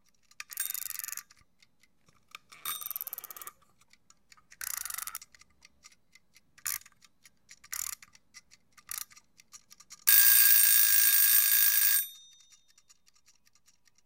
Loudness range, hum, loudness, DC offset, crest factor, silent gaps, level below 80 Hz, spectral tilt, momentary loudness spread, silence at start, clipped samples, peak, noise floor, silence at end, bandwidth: 21 LU; none; -23 LUFS; under 0.1%; 26 dB; none; -78 dBFS; 4.5 dB/octave; 24 LU; 0.5 s; under 0.1%; -4 dBFS; -69 dBFS; 1.9 s; 17 kHz